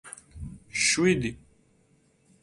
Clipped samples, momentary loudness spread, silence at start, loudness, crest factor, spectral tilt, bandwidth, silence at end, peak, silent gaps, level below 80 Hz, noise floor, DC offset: under 0.1%; 21 LU; 0.05 s; -25 LUFS; 20 dB; -3.5 dB/octave; 11.5 kHz; 1.05 s; -10 dBFS; none; -52 dBFS; -65 dBFS; under 0.1%